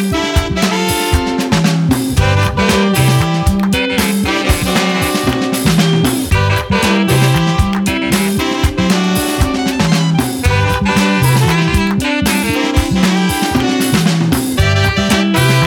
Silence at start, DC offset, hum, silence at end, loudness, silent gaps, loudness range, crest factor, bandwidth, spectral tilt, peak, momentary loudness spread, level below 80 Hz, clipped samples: 0 s; under 0.1%; none; 0 s; -13 LUFS; none; 1 LU; 12 dB; over 20 kHz; -5 dB/octave; 0 dBFS; 3 LU; -24 dBFS; under 0.1%